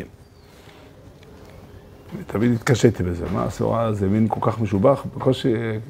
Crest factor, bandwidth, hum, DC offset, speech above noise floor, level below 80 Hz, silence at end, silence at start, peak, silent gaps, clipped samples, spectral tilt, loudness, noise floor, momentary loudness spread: 22 dB; 15.5 kHz; none; under 0.1%; 27 dB; -46 dBFS; 0 s; 0 s; 0 dBFS; none; under 0.1%; -7 dB/octave; -21 LUFS; -47 dBFS; 9 LU